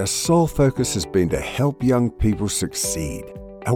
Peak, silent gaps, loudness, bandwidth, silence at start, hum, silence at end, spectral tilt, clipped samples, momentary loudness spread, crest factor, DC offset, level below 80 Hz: -6 dBFS; none; -21 LUFS; 18 kHz; 0 s; none; 0 s; -5 dB/octave; under 0.1%; 11 LU; 14 dB; under 0.1%; -36 dBFS